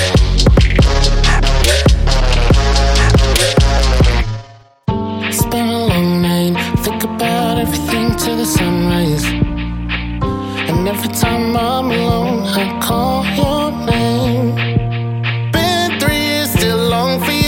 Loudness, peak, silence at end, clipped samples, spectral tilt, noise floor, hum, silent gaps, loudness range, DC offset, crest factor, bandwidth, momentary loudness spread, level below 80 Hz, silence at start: -14 LUFS; 0 dBFS; 0 s; under 0.1%; -5 dB/octave; -36 dBFS; none; none; 4 LU; under 0.1%; 14 dB; 17 kHz; 7 LU; -18 dBFS; 0 s